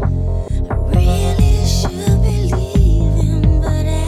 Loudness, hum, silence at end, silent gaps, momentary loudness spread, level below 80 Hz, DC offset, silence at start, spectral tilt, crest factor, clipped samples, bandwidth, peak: -16 LUFS; none; 0 s; none; 5 LU; -16 dBFS; under 0.1%; 0 s; -6.5 dB/octave; 12 dB; under 0.1%; 14 kHz; -2 dBFS